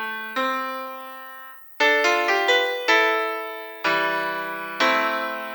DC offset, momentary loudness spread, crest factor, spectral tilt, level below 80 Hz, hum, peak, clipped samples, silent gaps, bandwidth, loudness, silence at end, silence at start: under 0.1%; 17 LU; 20 dB; -1.5 dB/octave; -84 dBFS; none; -4 dBFS; under 0.1%; none; 19.5 kHz; -21 LUFS; 0 s; 0 s